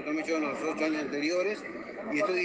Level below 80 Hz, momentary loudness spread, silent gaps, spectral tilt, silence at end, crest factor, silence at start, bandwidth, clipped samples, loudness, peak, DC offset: -72 dBFS; 8 LU; none; -4 dB/octave; 0 s; 14 dB; 0 s; 9.4 kHz; under 0.1%; -31 LUFS; -16 dBFS; under 0.1%